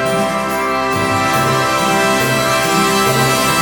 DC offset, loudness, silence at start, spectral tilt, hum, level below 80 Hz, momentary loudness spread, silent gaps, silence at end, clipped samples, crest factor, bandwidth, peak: under 0.1%; -14 LUFS; 0 s; -3.5 dB/octave; none; -42 dBFS; 4 LU; none; 0 s; under 0.1%; 12 dB; 18 kHz; -2 dBFS